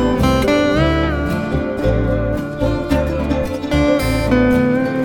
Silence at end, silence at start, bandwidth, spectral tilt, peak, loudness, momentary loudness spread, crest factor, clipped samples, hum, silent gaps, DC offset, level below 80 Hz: 0 s; 0 s; 18.5 kHz; -7 dB/octave; -2 dBFS; -17 LUFS; 6 LU; 14 dB; under 0.1%; none; none; under 0.1%; -26 dBFS